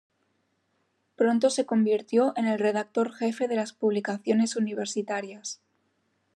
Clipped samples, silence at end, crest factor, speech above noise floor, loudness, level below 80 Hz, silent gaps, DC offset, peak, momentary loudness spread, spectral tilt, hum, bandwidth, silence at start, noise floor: under 0.1%; 0.8 s; 18 dB; 47 dB; -26 LUFS; -88 dBFS; none; under 0.1%; -10 dBFS; 9 LU; -5 dB/octave; none; 11 kHz; 1.2 s; -73 dBFS